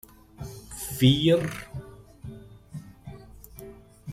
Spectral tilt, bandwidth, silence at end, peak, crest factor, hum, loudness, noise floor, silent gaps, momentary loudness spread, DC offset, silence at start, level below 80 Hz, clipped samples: -5.5 dB/octave; 16 kHz; 0 s; -8 dBFS; 20 dB; none; -24 LUFS; -46 dBFS; none; 26 LU; under 0.1%; 0.4 s; -52 dBFS; under 0.1%